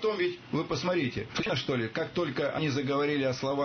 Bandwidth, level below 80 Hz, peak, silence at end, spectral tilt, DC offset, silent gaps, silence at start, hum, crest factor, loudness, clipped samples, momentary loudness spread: 6.6 kHz; -58 dBFS; -18 dBFS; 0 s; -5.5 dB/octave; under 0.1%; none; 0 s; none; 12 dB; -30 LUFS; under 0.1%; 4 LU